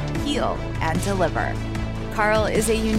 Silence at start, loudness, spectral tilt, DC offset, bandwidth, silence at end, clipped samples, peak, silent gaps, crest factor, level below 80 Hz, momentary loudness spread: 0 s; -23 LUFS; -5 dB/octave; under 0.1%; 16 kHz; 0 s; under 0.1%; -6 dBFS; none; 16 dB; -32 dBFS; 8 LU